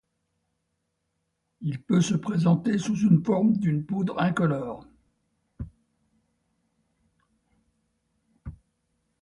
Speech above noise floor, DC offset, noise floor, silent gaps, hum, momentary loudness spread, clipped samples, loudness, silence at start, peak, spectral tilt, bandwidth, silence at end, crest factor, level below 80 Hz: 54 dB; under 0.1%; -78 dBFS; none; none; 21 LU; under 0.1%; -25 LUFS; 1.6 s; -10 dBFS; -7 dB/octave; 11 kHz; 0.65 s; 18 dB; -56 dBFS